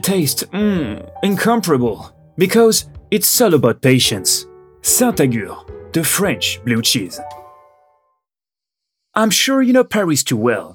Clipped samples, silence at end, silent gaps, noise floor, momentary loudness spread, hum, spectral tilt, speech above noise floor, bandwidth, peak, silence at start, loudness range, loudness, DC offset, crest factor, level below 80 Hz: under 0.1%; 0 s; none; -90 dBFS; 11 LU; none; -3.5 dB/octave; 74 dB; over 20 kHz; 0 dBFS; 0.05 s; 6 LU; -15 LUFS; under 0.1%; 16 dB; -50 dBFS